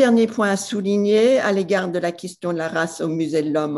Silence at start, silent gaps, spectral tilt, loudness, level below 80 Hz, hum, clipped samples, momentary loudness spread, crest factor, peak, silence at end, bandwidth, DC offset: 0 s; none; -5.5 dB/octave; -20 LUFS; -66 dBFS; none; under 0.1%; 9 LU; 16 dB; -4 dBFS; 0 s; 12.5 kHz; under 0.1%